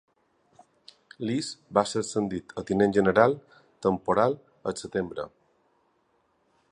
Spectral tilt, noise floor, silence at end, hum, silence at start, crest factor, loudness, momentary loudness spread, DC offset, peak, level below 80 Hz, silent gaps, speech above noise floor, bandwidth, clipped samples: -5.5 dB/octave; -70 dBFS; 1.45 s; none; 1.2 s; 24 dB; -27 LUFS; 14 LU; under 0.1%; -4 dBFS; -60 dBFS; none; 44 dB; 11 kHz; under 0.1%